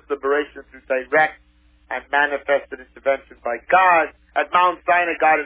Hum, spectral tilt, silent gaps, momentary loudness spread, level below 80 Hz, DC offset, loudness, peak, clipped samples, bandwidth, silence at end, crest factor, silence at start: none; -6.5 dB/octave; none; 12 LU; -56 dBFS; under 0.1%; -19 LUFS; -4 dBFS; under 0.1%; 4 kHz; 0 s; 18 dB; 0.1 s